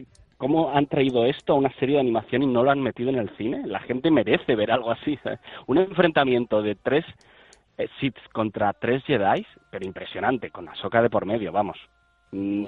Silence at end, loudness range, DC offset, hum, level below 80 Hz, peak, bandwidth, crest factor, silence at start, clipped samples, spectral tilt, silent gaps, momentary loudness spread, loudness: 0 s; 4 LU; under 0.1%; none; -58 dBFS; -4 dBFS; 7.2 kHz; 20 dB; 0 s; under 0.1%; -8 dB/octave; none; 12 LU; -24 LUFS